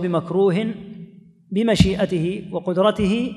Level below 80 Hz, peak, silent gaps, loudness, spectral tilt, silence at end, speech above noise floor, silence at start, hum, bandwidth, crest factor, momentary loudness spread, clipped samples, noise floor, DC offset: -38 dBFS; -2 dBFS; none; -20 LUFS; -6.5 dB/octave; 0 s; 23 dB; 0 s; none; 12 kHz; 20 dB; 13 LU; under 0.1%; -43 dBFS; under 0.1%